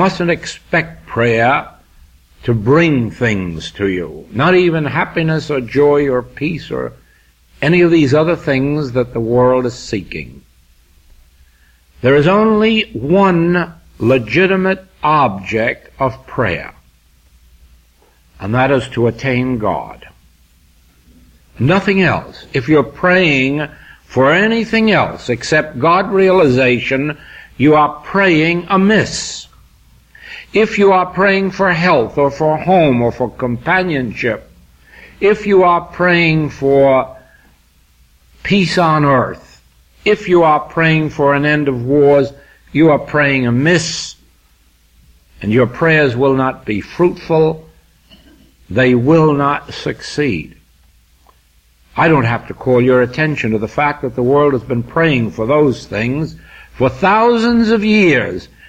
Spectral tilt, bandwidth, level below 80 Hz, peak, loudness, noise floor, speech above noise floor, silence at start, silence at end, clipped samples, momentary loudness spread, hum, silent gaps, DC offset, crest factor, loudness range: -6.5 dB/octave; 9.6 kHz; -42 dBFS; -2 dBFS; -14 LUFS; -52 dBFS; 39 dB; 0 s; 0.25 s; under 0.1%; 11 LU; none; none; under 0.1%; 14 dB; 5 LU